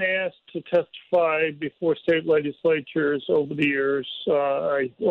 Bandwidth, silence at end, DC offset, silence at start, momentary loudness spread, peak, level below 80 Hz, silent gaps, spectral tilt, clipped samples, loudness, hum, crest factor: 4.9 kHz; 0 s; under 0.1%; 0 s; 5 LU; -10 dBFS; -66 dBFS; none; -7.5 dB/octave; under 0.1%; -24 LUFS; none; 14 dB